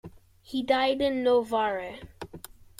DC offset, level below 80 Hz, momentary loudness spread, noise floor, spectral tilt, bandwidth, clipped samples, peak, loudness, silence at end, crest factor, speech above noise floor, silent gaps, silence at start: under 0.1%; -58 dBFS; 19 LU; -47 dBFS; -4.5 dB/octave; 16 kHz; under 0.1%; -10 dBFS; -26 LUFS; 0.4 s; 18 dB; 21 dB; none; 0.05 s